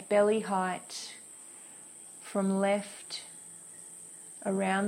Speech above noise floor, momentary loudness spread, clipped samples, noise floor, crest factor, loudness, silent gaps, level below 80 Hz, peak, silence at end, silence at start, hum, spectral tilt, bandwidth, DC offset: 20 dB; 19 LU; under 0.1%; -50 dBFS; 18 dB; -32 LUFS; none; -78 dBFS; -14 dBFS; 0 s; 0 s; none; -4.5 dB/octave; 15.5 kHz; under 0.1%